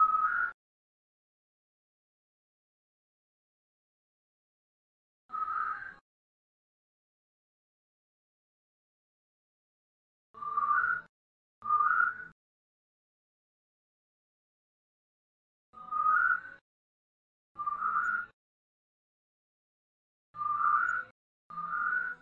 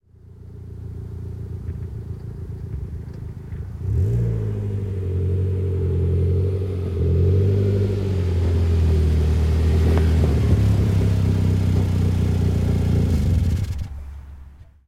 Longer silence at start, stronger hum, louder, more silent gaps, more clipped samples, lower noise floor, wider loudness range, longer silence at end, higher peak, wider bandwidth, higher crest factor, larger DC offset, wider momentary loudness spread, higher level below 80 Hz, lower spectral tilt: second, 0 s vs 0.3 s; neither; second, -31 LUFS vs -21 LUFS; first, 0.54-5.29 s, 6.01-10.34 s, 11.09-11.62 s, 12.32-15.73 s, 16.61-17.55 s, 18.33-20.34 s, 21.11-21.50 s vs none; neither; first, under -90 dBFS vs -43 dBFS; about the same, 9 LU vs 10 LU; second, 0.05 s vs 0.25 s; second, -16 dBFS vs -6 dBFS; second, 7.4 kHz vs 10 kHz; first, 20 dB vs 14 dB; neither; first, 19 LU vs 15 LU; second, -76 dBFS vs -30 dBFS; second, -3.5 dB/octave vs -8.5 dB/octave